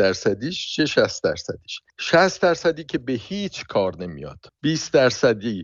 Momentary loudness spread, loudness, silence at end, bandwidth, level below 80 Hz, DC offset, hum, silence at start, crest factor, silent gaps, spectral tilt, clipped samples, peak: 15 LU; -22 LUFS; 0 s; 7.8 kHz; -54 dBFS; under 0.1%; none; 0 s; 18 dB; none; -4.5 dB/octave; under 0.1%; -4 dBFS